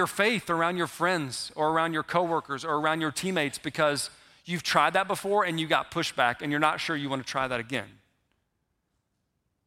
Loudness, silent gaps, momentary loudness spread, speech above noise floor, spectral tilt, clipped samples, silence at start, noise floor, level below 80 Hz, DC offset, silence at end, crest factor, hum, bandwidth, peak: -27 LUFS; none; 7 LU; 50 dB; -4 dB/octave; under 0.1%; 0 s; -78 dBFS; -66 dBFS; under 0.1%; 1.75 s; 22 dB; none; 16.5 kHz; -6 dBFS